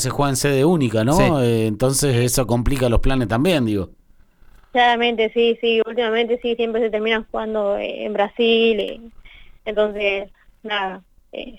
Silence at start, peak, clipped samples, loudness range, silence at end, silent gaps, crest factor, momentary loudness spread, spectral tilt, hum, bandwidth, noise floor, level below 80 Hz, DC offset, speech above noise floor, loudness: 0 s; -6 dBFS; under 0.1%; 3 LU; 0 s; none; 14 dB; 10 LU; -5 dB/octave; none; 19.5 kHz; -50 dBFS; -32 dBFS; under 0.1%; 31 dB; -19 LUFS